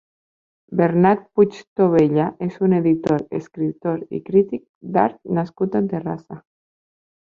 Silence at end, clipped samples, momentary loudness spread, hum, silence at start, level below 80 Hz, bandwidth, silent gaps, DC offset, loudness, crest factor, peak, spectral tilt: 0.9 s; under 0.1%; 11 LU; none; 0.7 s; -58 dBFS; 7.2 kHz; 1.67-1.76 s, 4.69-4.81 s; under 0.1%; -20 LUFS; 18 dB; -2 dBFS; -9.5 dB/octave